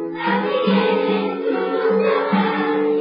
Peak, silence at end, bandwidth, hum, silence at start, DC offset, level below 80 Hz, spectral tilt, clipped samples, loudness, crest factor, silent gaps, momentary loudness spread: -6 dBFS; 0 s; 5.4 kHz; none; 0 s; under 0.1%; -76 dBFS; -11.5 dB/octave; under 0.1%; -19 LUFS; 12 dB; none; 4 LU